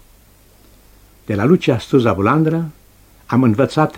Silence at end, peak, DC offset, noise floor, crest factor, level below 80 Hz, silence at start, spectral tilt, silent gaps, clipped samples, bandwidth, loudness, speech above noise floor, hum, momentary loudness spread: 0 s; 0 dBFS; under 0.1%; -48 dBFS; 16 dB; -48 dBFS; 1.3 s; -8 dB/octave; none; under 0.1%; 16.5 kHz; -16 LUFS; 34 dB; 50 Hz at -40 dBFS; 8 LU